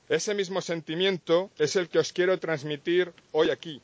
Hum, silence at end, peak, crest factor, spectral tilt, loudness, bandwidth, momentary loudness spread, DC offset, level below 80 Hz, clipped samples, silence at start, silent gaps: none; 0.05 s; -12 dBFS; 16 dB; -4 dB/octave; -27 LUFS; 8 kHz; 5 LU; under 0.1%; -72 dBFS; under 0.1%; 0.1 s; none